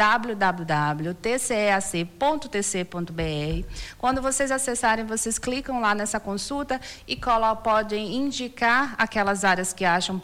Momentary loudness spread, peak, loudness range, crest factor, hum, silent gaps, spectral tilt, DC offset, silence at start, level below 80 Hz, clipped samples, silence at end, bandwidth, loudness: 7 LU; -10 dBFS; 2 LU; 16 dB; none; none; -3.5 dB/octave; under 0.1%; 0 s; -44 dBFS; under 0.1%; 0 s; 19 kHz; -24 LUFS